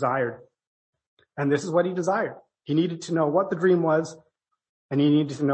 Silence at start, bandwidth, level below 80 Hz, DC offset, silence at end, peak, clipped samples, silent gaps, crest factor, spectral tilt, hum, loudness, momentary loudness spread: 0 s; 8.6 kHz; -72 dBFS; under 0.1%; 0 s; -8 dBFS; under 0.1%; 0.67-0.93 s, 1.07-1.17 s, 4.69-4.89 s; 16 dB; -7 dB/octave; none; -24 LUFS; 10 LU